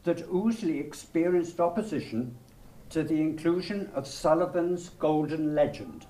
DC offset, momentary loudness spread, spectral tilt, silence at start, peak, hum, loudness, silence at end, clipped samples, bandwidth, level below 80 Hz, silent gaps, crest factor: under 0.1%; 8 LU; -6.5 dB/octave; 0.05 s; -10 dBFS; none; -29 LUFS; 0 s; under 0.1%; 15 kHz; -56 dBFS; none; 18 dB